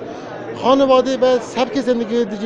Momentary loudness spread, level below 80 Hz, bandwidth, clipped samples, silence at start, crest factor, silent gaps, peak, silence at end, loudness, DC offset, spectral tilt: 16 LU; -52 dBFS; 8.2 kHz; under 0.1%; 0 s; 16 dB; none; 0 dBFS; 0 s; -16 LUFS; under 0.1%; -5 dB/octave